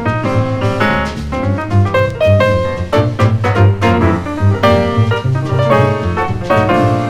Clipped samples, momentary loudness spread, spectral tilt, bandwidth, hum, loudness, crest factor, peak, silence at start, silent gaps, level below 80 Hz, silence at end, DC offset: under 0.1%; 5 LU; -7.5 dB/octave; 10.5 kHz; none; -13 LUFS; 12 dB; 0 dBFS; 0 s; none; -32 dBFS; 0 s; under 0.1%